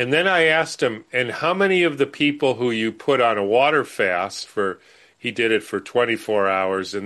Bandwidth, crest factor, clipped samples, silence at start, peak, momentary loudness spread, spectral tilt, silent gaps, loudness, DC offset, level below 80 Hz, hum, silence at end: 12.5 kHz; 16 dB; under 0.1%; 0 s; -4 dBFS; 8 LU; -4.5 dB/octave; none; -20 LUFS; under 0.1%; -66 dBFS; none; 0 s